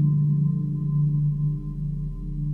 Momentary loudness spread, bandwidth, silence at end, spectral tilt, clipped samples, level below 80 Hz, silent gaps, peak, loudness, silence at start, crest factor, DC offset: 9 LU; 1.1 kHz; 0 s; -13 dB/octave; under 0.1%; -38 dBFS; none; -12 dBFS; -25 LUFS; 0 s; 12 dB; under 0.1%